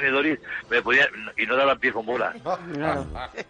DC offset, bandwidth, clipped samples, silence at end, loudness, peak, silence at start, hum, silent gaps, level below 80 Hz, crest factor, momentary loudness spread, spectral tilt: under 0.1%; 9.8 kHz; under 0.1%; 0.05 s; -23 LUFS; -8 dBFS; 0 s; none; none; -50 dBFS; 16 dB; 11 LU; -5 dB/octave